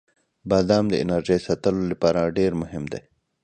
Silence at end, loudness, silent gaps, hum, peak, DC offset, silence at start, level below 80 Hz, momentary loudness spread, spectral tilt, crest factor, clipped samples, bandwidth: 0.45 s; -22 LUFS; none; none; -6 dBFS; under 0.1%; 0.45 s; -48 dBFS; 13 LU; -6.5 dB/octave; 18 dB; under 0.1%; 9.4 kHz